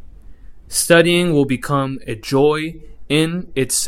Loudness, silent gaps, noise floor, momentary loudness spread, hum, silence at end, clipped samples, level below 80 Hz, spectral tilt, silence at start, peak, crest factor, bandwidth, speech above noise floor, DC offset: -17 LUFS; none; -36 dBFS; 11 LU; none; 0 s; under 0.1%; -42 dBFS; -4 dB/octave; 0 s; 0 dBFS; 18 dB; 16 kHz; 20 dB; under 0.1%